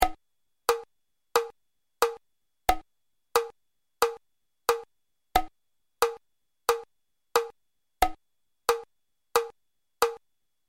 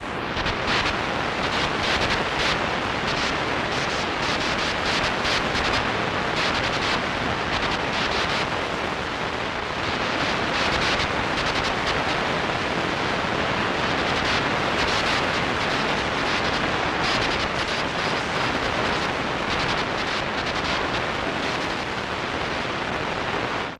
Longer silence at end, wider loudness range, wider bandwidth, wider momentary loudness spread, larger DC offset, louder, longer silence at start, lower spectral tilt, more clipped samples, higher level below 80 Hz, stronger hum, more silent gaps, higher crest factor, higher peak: first, 0.5 s vs 0 s; about the same, 1 LU vs 2 LU; about the same, 16.5 kHz vs 15 kHz; first, 12 LU vs 4 LU; neither; second, -30 LUFS vs -23 LUFS; about the same, 0 s vs 0 s; second, -2 dB/octave vs -3.5 dB/octave; neither; second, -48 dBFS vs -42 dBFS; neither; neither; first, 26 dB vs 14 dB; first, -6 dBFS vs -10 dBFS